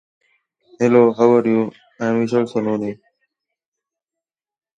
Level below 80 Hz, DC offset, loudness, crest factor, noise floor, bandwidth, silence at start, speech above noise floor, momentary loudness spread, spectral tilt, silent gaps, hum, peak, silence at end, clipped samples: -66 dBFS; under 0.1%; -17 LUFS; 20 dB; -87 dBFS; 7.8 kHz; 0.8 s; 71 dB; 12 LU; -7.5 dB/octave; none; none; 0 dBFS; 1.85 s; under 0.1%